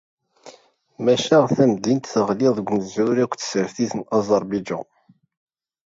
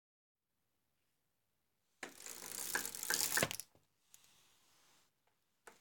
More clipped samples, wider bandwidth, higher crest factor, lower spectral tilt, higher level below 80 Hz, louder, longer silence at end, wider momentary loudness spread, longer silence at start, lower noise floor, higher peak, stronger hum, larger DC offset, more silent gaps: neither; second, 7.8 kHz vs 19 kHz; second, 18 dB vs 30 dB; first, -5.5 dB/octave vs -1 dB/octave; first, -62 dBFS vs -78 dBFS; first, -21 LUFS vs -39 LUFS; first, 1.1 s vs 0.1 s; second, 9 LU vs 17 LU; second, 0.45 s vs 2 s; second, -52 dBFS vs -88 dBFS; first, -4 dBFS vs -16 dBFS; neither; neither; neither